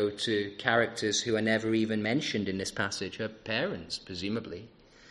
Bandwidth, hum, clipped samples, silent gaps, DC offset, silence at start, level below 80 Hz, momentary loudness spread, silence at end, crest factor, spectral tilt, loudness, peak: 11.5 kHz; none; under 0.1%; none; under 0.1%; 0 s; -64 dBFS; 10 LU; 0 s; 22 dB; -4 dB/octave; -30 LUFS; -8 dBFS